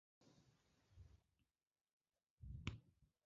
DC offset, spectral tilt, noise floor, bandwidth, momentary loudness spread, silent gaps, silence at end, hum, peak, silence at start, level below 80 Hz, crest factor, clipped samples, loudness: under 0.1%; -5 dB/octave; under -90 dBFS; 7.2 kHz; 16 LU; 1.81-1.85 s, 1.93-2.00 s, 2.30-2.37 s; 0.2 s; none; -30 dBFS; 0.2 s; -66 dBFS; 32 dB; under 0.1%; -56 LUFS